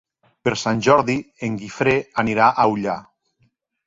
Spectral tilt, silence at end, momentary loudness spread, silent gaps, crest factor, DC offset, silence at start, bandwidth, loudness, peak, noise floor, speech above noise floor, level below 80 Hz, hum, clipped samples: -5.5 dB/octave; 0.85 s; 11 LU; none; 20 dB; under 0.1%; 0.45 s; 7.8 kHz; -19 LUFS; -2 dBFS; -65 dBFS; 46 dB; -54 dBFS; none; under 0.1%